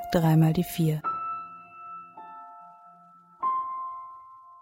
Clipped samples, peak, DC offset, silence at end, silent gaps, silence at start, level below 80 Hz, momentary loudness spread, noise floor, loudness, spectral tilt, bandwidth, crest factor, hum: under 0.1%; -10 dBFS; under 0.1%; 0.1 s; none; 0 s; -56 dBFS; 23 LU; -54 dBFS; -27 LUFS; -7.5 dB/octave; 16.5 kHz; 20 dB; none